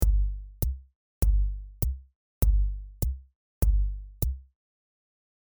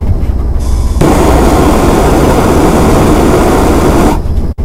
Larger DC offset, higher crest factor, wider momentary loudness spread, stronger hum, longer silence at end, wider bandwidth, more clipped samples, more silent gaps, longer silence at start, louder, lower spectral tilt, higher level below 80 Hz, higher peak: first, 0.2% vs under 0.1%; first, 20 dB vs 6 dB; about the same, 8 LU vs 7 LU; first, 50 Hz at -35 dBFS vs none; first, 1 s vs 0 s; first, over 20 kHz vs 16.5 kHz; second, under 0.1% vs 2%; first, 0.95-1.21 s, 2.15-2.41 s, 3.35-3.61 s vs none; about the same, 0 s vs 0 s; second, -31 LUFS vs -8 LUFS; about the same, -6.5 dB/octave vs -6.5 dB/octave; second, -28 dBFS vs -12 dBFS; second, -8 dBFS vs 0 dBFS